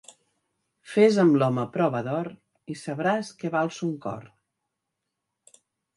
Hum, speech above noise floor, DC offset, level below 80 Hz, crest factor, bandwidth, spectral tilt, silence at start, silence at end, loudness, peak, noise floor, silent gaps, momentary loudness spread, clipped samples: none; 59 dB; under 0.1%; -72 dBFS; 20 dB; 11.5 kHz; -7 dB/octave; 0.85 s; 1.7 s; -25 LUFS; -8 dBFS; -83 dBFS; none; 17 LU; under 0.1%